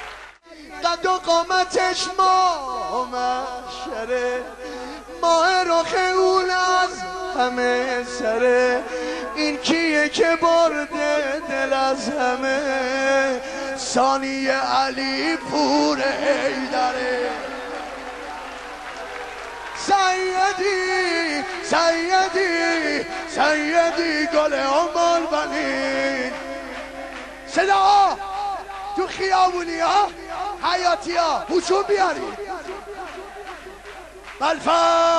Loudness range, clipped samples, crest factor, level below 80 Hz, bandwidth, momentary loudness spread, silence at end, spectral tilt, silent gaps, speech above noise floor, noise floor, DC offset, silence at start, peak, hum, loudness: 4 LU; under 0.1%; 16 dB; -52 dBFS; 12.5 kHz; 15 LU; 0 s; -2 dB/octave; none; 22 dB; -42 dBFS; under 0.1%; 0 s; -6 dBFS; none; -20 LUFS